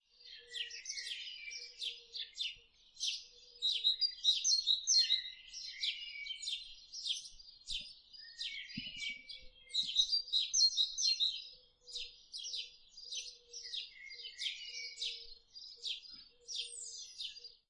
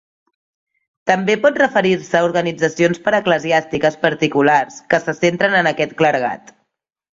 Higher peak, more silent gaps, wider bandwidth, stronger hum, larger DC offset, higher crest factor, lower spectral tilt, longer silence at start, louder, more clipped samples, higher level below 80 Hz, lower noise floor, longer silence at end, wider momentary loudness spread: second, -20 dBFS vs 0 dBFS; neither; first, 11.5 kHz vs 7.8 kHz; neither; neither; about the same, 20 dB vs 16 dB; second, 2.5 dB/octave vs -5 dB/octave; second, 0.2 s vs 1.05 s; second, -36 LUFS vs -16 LUFS; neither; second, -70 dBFS vs -58 dBFS; second, -59 dBFS vs -74 dBFS; second, 0.15 s vs 0.85 s; first, 21 LU vs 5 LU